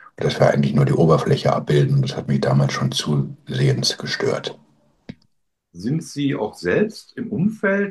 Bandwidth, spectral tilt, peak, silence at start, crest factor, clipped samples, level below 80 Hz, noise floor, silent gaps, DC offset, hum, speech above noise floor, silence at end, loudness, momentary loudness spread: 12.5 kHz; -6 dB/octave; -2 dBFS; 0.2 s; 18 dB; under 0.1%; -52 dBFS; -68 dBFS; none; under 0.1%; none; 49 dB; 0 s; -20 LUFS; 9 LU